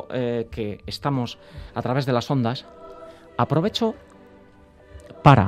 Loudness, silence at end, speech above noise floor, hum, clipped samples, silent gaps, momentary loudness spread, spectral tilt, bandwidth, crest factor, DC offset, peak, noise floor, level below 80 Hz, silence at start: -24 LUFS; 0 s; 26 dB; none; under 0.1%; none; 20 LU; -7 dB/octave; 13 kHz; 24 dB; under 0.1%; 0 dBFS; -50 dBFS; -48 dBFS; 0 s